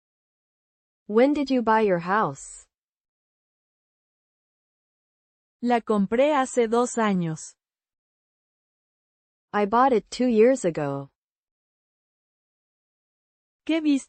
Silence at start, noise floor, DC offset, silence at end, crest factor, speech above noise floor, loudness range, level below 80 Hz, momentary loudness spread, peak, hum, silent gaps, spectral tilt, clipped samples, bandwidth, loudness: 1.1 s; under -90 dBFS; under 0.1%; 0.05 s; 18 dB; over 68 dB; 8 LU; -64 dBFS; 12 LU; -8 dBFS; none; 2.82-5.60 s, 7.98-9.48 s, 11.16-13.60 s; -5.5 dB/octave; under 0.1%; 8.8 kHz; -23 LUFS